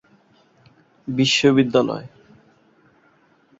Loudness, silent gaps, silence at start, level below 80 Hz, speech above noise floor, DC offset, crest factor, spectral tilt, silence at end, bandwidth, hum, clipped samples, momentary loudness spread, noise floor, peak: -18 LUFS; none; 1.05 s; -60 dBFS; 40 dB; under 0.1%; 20 dB; -5 dB/octave; 1.55 s; 8 kHz; none; under 0.1%; 16 LU; -58 dBFS; -2 dBFS